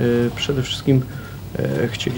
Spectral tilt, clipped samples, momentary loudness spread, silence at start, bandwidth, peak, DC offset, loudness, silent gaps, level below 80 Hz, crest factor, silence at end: -6 dB/octave; under 0.1%; 12 LU; 0 s; 19 kHz; -4 dBFS; under 0.1%; -21 LUFS; none; -42 dBFS; 16 dB; 0 s